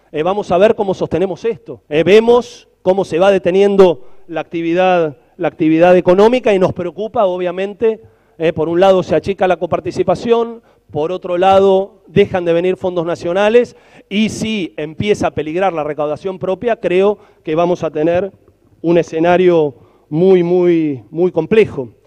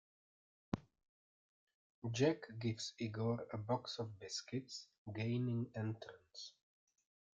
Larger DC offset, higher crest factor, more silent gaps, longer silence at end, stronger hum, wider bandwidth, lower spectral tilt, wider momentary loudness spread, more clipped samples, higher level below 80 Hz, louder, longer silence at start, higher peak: neither; second, 14 dB vs 22 dB; second, none vs 1.09-1.67 s, 1.74-2.02 s, 4.98-5.06 s; second, 0.15 s vs 0.85 s; neither; first, 9.8 kHz vs 7.8 kHz; about the same, -6.5 dB/octave vs -5.5 dB/octave; second, 11 LU vs 15 LU; neither; first, -48 dBFS vs -76 dBFS; first, -14 LUFS vs -43 LUFS; second, 0.15 s vs 0.75 s; first, 0 dBFS vs -22 dBFS